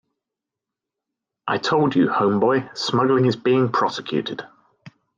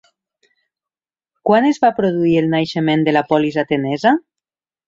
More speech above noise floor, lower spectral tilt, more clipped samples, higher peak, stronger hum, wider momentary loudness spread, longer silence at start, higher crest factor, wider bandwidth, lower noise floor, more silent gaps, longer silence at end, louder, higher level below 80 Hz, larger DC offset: second, 66 dB vs over 75 dB; about the same, -6 dB/octave vs -7 dB/octave; neither; second, -6 dBFS vs -2 dBFS; neither; first, 8 LU vs 5 LU; about the same, 1.45 s vs 1.45 s; about the same, 16 dB vs 16 dB; about the same, 7.6 kHz vs 7.6 kHz; second, -86 dBFS vs under -90 dBFS; neither; second, 0.3 s vs 0.7 s; second, -20 LUFS vs -16 LUFS; second, -66 dBFS vs -58 dBFS; neither